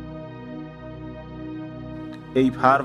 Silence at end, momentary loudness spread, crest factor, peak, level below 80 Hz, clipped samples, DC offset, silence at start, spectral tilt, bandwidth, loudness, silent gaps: 0 s; 18 LU; 22 dB; -2 dBFS; -48 dBFS; under 0.1%; under 0.1%; 0 s; -7.5 dB/octave; 10.5 kHz; -27 LUFS; none